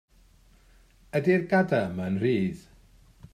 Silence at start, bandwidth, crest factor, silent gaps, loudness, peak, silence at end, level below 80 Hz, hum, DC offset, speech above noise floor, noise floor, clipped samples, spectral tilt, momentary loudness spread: 1.15 s; 12.5 kHz; 18 dB; none; -26 LUFS; -10 dBFS; 0.75 s; -58 dBFS; none; under 0.1%; 33 dB; -58 dBFS; under 0.1%; -8 dB/octave; 9 LU